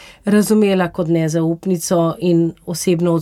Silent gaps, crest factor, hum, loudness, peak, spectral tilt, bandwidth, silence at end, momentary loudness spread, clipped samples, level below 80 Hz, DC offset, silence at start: none; 14 dB; none; -17 LUFS; -2 dBFS; -6 dB/octave; 16 kHz; 0 s; 5 LU; under 0.1%; -52 dBFS; under 0.1%; 0 s